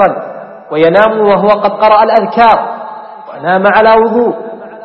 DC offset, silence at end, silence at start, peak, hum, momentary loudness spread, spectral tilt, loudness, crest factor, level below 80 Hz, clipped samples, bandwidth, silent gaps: under 0.1%; 0 s; 0 s; 0 dBFS; none; 19 LU; -7.5 dB/octave; -8 LUFS; 10 dB; -46 dBFS; 0.2%; 5.8 kHz; none